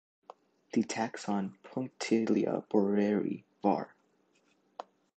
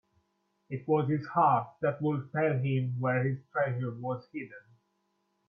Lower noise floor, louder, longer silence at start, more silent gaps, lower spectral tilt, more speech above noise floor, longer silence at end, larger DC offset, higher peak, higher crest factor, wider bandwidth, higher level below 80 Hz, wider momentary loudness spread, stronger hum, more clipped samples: second, -71 dBFS vs -77 dBFS; about the same, -32 LUFS vs -30 LUFS; about the same, 0.75 s vs 0.7 s; neither; second, -6 dB/octave vs -10.5 dB/octave; second, 40 dB vs 47 dB; second, 0.35 s vs 0.9 s; neither; about the same, -12 dBFS vs -14 dBFS; about the same, 20 dB vs 18 dB; first, 9 kHz vs 5 kHz; second, -78 dBFS vs -72 dBFS; first, 19 LU vs 14 LU; neither; neither